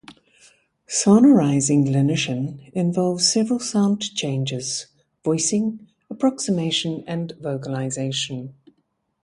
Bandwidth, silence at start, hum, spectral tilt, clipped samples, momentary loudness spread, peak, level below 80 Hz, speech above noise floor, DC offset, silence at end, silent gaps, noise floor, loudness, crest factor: 11.5 kHz; 0.1 s; none; -4.5 dB/octave; under 0.1%; 12 LU; -4 dBFS; -64 dBFS; 50 dB; under 0.1%; 0.7 s; none; -70 dBFS; -21 LUFS; 18 dB